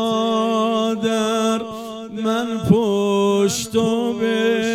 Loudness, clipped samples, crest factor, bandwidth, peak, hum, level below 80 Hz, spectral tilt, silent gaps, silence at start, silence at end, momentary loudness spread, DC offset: -19 LUFS; under 0.1%; 18 dB; 15.5 kHz; -2 dBFS; none; -54 dBFS; -5 dB/octave; none; 0 s; 0 s; 7 LU; under 0.1%